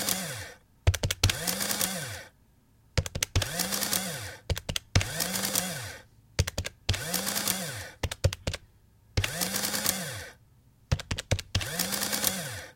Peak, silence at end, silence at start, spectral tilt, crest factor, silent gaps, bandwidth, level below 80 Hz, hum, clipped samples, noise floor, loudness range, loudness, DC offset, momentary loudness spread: -2 dBFS; 0.05 s; 0 s; -2.5 dB/octave; 28 dB; none; 17 kHz; -42 dBFS; none; under 0.1%; -62 dBFS; 2 LU; -30 LUFS; under 0.1%; 11 LU